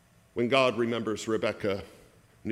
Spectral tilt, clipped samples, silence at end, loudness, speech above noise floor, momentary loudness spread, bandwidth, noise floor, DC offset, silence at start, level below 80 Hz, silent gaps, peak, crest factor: -5 dB/octave; under 0.1%; 0 s; -28 LUFS; 25 dB; 13 LU; 15 kHz; -53 dBFS; under 0.1%; 0.35 s; -66 dBFS; none; -8 dBFS; 22 dB